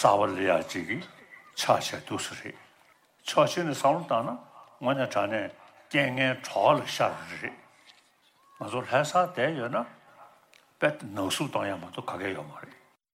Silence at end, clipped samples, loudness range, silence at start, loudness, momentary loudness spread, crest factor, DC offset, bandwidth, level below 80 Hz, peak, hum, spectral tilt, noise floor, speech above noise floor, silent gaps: 0.4 s; under 0.1%; 3 LU; 0 s; -28 LUFS; 15 LU; 22 dB; under 0.1%; 16.5 kHz; -76 dBFS; -6 dBFS; none; -4.5 dB/octave; -64 dBFS; 36 dB; none